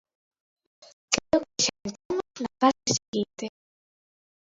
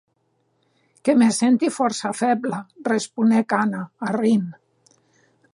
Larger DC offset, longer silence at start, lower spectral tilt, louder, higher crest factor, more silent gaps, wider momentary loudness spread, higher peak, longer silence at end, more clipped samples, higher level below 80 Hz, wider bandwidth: neither; about the same, 1.1 s vs 1.05 s; second, -2.5 dB/octave vs -5 dB/octave; second, -27 LUFS vs -21 LUFS; first, 30 dB vs 16 dB; first, 2.05-2.10 s, 3.08-3.13 s vs none; first, 13 LU vs 10 LU; first, 0 dBFS vs -6 dBFS; about the same, 1.1 s vs 1 s; neither; first, -60 dBFS vs -74 dBFS; second, 8 kHz vs 11.5 kHz